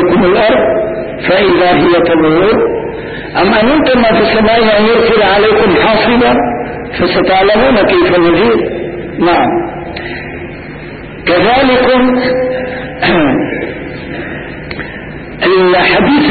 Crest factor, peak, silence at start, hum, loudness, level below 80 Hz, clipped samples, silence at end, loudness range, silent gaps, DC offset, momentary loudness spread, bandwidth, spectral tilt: 10 dB; 0 dBFS; 0 s; none; -9 LUFS; -32 dBFS; under 0.1%; 0 s; 5 LU; none; under 0.1%; 14 LU; 4.8 kHz; -11.5 dB/octave